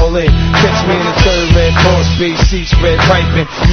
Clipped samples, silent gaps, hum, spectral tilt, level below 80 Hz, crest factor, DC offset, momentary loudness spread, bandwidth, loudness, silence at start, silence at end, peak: 0.1%; none; none; -5.5 dB/octave; -14 dBFS; 10 dB; under 0.1%; 3 LU; 6.8 kHz; -10 LUFS; 0 s; 0 s; 0 dBFS